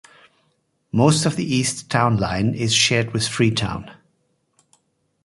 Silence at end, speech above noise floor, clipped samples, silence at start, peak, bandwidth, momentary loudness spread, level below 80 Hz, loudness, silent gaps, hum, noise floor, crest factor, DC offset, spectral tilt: 1.35 s; 48 dB; under 0.1%; 0.95 s; -2 dBFS; 11.5 kHz; 8 LU; -46 dBFS; -19 LUFS; none; none; -67 dBFS; 20 dB; under 0.1%; -4 dB/octave